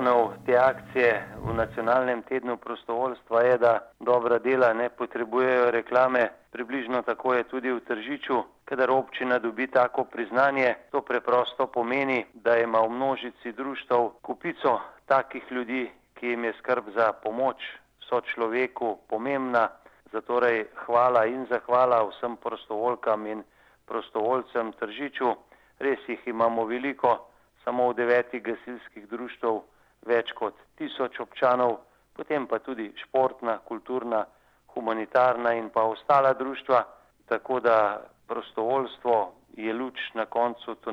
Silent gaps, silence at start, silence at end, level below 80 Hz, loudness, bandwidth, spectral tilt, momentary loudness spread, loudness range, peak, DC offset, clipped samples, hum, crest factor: none; 0 s; 0 s; -64 dBFS; -26 LUFS; 7 kHz; -6.5 dB/octave; 12 LU; 4 LU; -8 dBFS; under 0.1%; under 0.1%; none; 18 dB